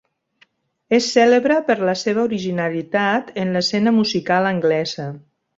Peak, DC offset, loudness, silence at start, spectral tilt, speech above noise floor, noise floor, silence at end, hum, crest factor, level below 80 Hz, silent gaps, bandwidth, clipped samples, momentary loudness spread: -2 dBFS; under 0.1%; -18 LUFS; 0.9 s; -5 dB/octave; 41 dB; -59 dBFS; 0.4 s; none; 18 dB; -62 dBFS; none; 8 kHz; under 0.1%; 8 LU